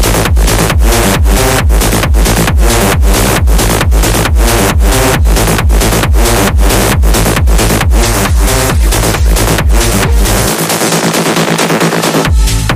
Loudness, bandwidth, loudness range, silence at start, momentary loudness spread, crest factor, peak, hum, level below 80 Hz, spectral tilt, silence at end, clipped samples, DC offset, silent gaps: -9 LUFS; 16 kHz; 1 LU; 0 s; 1 LU; 8 dB; 0 dBFS; none; -10 dBFS; -4 dB/octave; 0 s; 0.3%; under 0.1%; none